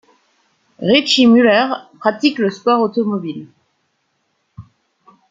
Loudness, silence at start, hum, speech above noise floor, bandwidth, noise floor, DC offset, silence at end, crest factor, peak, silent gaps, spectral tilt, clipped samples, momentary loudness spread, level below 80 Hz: -14 LUFS; 0.8 s; none; 52 dB; 7.8 kHz; -67 dBFS; under 0.1%; 0.7 s; 16 dB; -2 dBFS; none; -4.5 dB/octave; under 0.1%; 14 LU; -60 dBFS